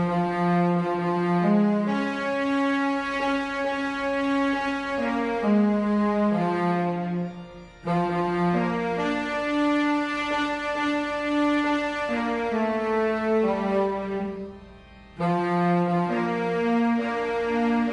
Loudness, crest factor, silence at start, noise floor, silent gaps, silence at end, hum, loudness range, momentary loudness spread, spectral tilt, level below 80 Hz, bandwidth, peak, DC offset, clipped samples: -25 LUFS; 14 dB; 0 s; -47 dBFS; none; 0 s; none; 2 LU; 4 LU; -7 dB/octave; -54 dBFS; 10.5 kHz; -12 dBFS; under 0.1%; under 0.1%